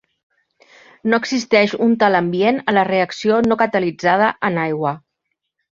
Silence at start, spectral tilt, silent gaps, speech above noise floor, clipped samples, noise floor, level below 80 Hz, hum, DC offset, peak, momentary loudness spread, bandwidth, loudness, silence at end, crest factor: 1.05 s; -5.5 dB/octave; none; 59 dB; under 0.1%; -75 dBFS; -60 dBFS; none; under 0.1%; -2 dBFS; 5 LU; 7.6 kHz; -17 LUFS; 0.75 s; 16 dB